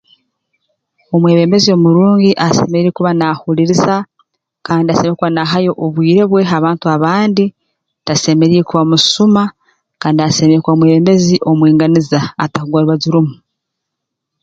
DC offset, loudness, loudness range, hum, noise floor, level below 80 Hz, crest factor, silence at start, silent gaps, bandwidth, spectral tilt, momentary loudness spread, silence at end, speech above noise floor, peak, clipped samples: under 0.1%; -11 LUFS; 3 LU; none; -76 dBFS; -50 dBFS; 12 dB; 1.1 s; none; 7.8 kHz; -6 dB/octave; 8 LU; 1.1 s; 66 dB; 0 dBFS; under 0.1%